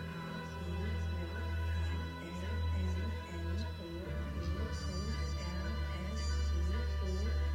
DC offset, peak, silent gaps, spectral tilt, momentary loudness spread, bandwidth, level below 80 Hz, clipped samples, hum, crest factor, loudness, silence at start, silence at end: under 0.1%; -26 dBFS; none; -6 dB/octave; 6 LU; 10 kHz; -40 dBFS; under 0.1%; none; 10 dB; -39 LUFS; 0 s; 0 s